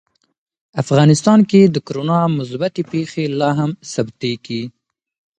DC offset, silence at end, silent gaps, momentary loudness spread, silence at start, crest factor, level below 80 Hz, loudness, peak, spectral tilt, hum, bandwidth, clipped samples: under 0.1%; 0.7 s; none; 13 LU; 0.75 s; 16 dB; -58 dBFS; -16 LUFS; 0 dBFS; -6.5 dB/octave; none; 9.4 kHz; under 0.1%